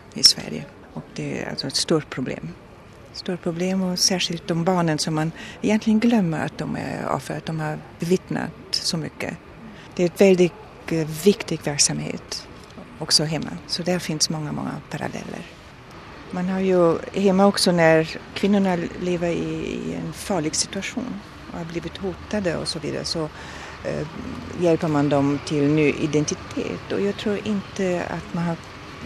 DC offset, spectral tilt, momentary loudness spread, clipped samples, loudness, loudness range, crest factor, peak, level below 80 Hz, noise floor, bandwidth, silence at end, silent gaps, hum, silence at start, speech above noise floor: under 0.1%; -4.5 dB/octave; 16 LU; under 0.1%; -23 LUFS; 6 LU; 24 dB; 0 dBFS; -50 dBFS; -44 dBFS; 13.5 kHz; 0 s; none; none; 0.05 s; 21 dB